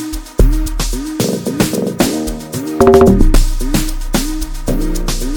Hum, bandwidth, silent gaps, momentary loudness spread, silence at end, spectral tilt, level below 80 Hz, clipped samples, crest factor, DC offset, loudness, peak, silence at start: none; 19 kHz; none; 13 LU; 0 s; -5.5 dB/octave; -16 dBFS; under 0.1%; 12 dB; under 0.1%; -15 LUFS; 0 dBFS; 0 s